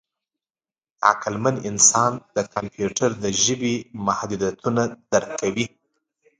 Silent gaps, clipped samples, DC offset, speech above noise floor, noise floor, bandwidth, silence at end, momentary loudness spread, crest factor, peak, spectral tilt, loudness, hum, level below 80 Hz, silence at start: none; under 0.1%; under 0.1%; over 68 dB; under -90 dBFS; 10.5 kHz; 0.75 s; 11 LU; 22 dB; 0 dBFS; -3 dB/octave; -21 LUFS; none; -56 dBFS; 1 s